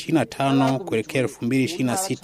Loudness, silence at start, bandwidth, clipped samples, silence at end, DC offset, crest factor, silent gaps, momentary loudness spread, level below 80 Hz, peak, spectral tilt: -22 LUFS; 0 s; 15.5 kHz; under 0.1%; 0.05 s; under 0.1%; 16 dB; none; 4 LU; -58 dBFS; -6 dBFS; -5.5 dB/octave